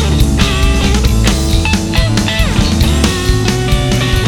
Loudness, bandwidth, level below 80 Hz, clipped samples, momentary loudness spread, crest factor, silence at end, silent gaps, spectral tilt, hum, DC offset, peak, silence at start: -12 LUFS; 18 kHz; -14 dBFS; under 0.1%; 2 LU; 10 dB; 0 s; none; -5 dB/octave; none; under 0.1%; 0 dBFS; 0 s